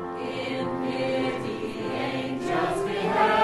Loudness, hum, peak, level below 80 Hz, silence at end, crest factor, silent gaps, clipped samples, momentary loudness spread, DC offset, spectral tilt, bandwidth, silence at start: -28 LUFS; none; -10 dBFS; -58 dBFS; 0 s; 18 dB; none; under 0.1%; 7 LU; under 0.1%; -5.5 dB/octave; 12.5 kHz; 0 s